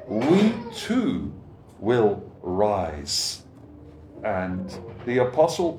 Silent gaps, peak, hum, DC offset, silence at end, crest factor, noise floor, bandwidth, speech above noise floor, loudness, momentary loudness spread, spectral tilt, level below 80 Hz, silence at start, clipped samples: none; -6 dBFS; none; under 0.1%; 0 s; 18 dB; -45 dBFS; 18.5 kHz; 22 dB; -24 LUFS; 13 LU; -5 dB/octave; -50 dBFS; 0 s; under 0.1%